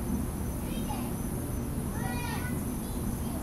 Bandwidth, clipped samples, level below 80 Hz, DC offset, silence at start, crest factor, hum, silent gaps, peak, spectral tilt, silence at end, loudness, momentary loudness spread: 16 kHz; under 0.1%; -40 dBFS; under 0.1%; 0 s; 14 dB; none; none; -18 dBFS; -5.5 dB/octave; 0 s; -34 LUFS; 1 LU